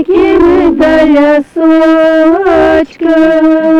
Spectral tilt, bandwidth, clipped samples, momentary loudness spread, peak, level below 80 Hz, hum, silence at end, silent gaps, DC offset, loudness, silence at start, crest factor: -6.5 dB/octave; 7.2 kHz; under 0.1%; 3 LU; -2 dBFS; -32 dBFS; none; 0 s; none; 1%; -7 LUFS; 0 s; 6 dB